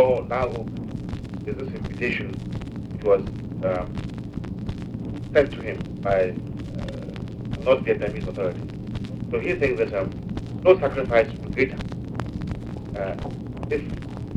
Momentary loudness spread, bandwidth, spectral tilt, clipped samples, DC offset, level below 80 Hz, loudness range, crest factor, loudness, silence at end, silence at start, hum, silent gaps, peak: 12 LU; 10 kHz; -8 dB/octave; under 0.1%; under 0.1%; -40 dBFS; 4 LU; 22 dB; -26 LUFS; 0 s; 0 s; none; none; -2 dBFS